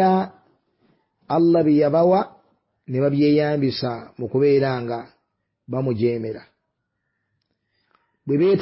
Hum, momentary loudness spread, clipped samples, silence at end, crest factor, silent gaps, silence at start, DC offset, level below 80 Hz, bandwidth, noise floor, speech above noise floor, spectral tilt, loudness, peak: none; 15 LU; under 0.1%; 0 s; 14 dB; none; 0 s; under 0.1%; -60 dBFS; 5.8 kHz; -76 dBFS; 57 dB; -12 dB/octave; -20 LUFS; -6 dBFS